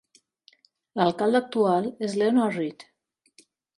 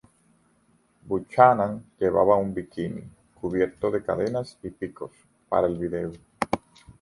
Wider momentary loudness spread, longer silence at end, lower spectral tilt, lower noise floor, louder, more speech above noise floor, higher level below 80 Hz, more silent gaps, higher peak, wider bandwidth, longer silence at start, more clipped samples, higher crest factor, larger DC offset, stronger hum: second, 9 LU vs 17 LU; first, 0.95 s vs 0.45 s; about the same, -6.5 dB/octave vs -7.5 dB/octave; about the same, -61 dBFS vs -64 dBFS; about the same, -24 LUFS vs -25 LUFS; about the same, 37 dB vs 40 dB; second, -74 dBFS vs -54 dBFS; neither; second, -6 dBFS vs -2 dBFS; about the same, 11.5 kHz vs 11.5 kHz; about the same, 0.95 s vs 1.05 s; neither; about the same, 20 dB vs 24 dB; neither; neither